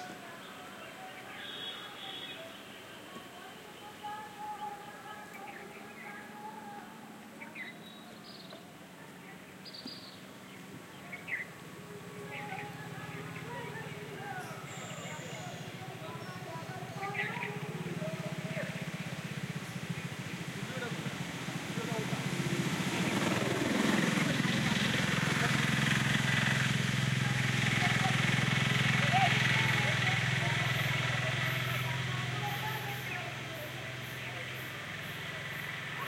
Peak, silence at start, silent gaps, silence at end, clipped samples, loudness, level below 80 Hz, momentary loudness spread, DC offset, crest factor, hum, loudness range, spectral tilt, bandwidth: -16 dBFS; 0 s; none; 0 s; under 0.1%; -33 LUFS; -66 dBFS; 19 LU; under 0.1%; 20 dB; none; 17 LU; -4.5 dB/octave; 16.5 kHz